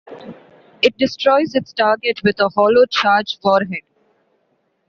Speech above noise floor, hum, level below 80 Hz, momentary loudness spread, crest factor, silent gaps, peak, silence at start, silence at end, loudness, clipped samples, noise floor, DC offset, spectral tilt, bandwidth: 50 dB; none; -60 dBFS; 11 LU; 16 dB; none; -2 dBFS; 0.1 s; 1.1 s; -16 LUFS; under 0.1%; -65 dBFS; under 0.1%; -2 dB/octave; 7.2 kHz